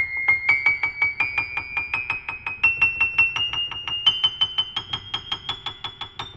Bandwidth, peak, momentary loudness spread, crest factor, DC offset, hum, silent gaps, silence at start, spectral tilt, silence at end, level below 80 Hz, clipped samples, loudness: 10 kHz; -6 dBFS; 12 LU; 18 dB; under 0.1%; none; none; 0 s; -1.5 dB/octave; 0 s; -52 dBFS; under 0.1%; -21 LUFS